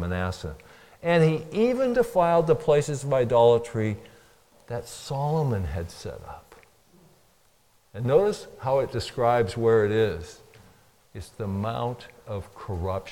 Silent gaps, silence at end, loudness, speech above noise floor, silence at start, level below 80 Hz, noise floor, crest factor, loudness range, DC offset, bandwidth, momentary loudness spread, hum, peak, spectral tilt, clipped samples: none; 0 s; -25 LUFS; 39 dB; 0 s; -50 dBFS; -63 dBFS; 18 dB; 10 LU; under 0.1%; 16 kHz; 18 LU; none; -8 dBFS; -6.5 dB/octave; under 0.1%